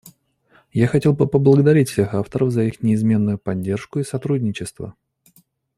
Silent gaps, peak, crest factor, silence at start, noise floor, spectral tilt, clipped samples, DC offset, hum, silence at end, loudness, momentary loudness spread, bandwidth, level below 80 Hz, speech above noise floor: none; -2 dBFS; 16 dB; 0.05 s; -57 dBFS; -8 dB/octave; under 0.1%; under 0.1%; none; 0.85 s; -19 LUFS; 12 LU; 14.5 kHz; -52 dBFS; 40 dB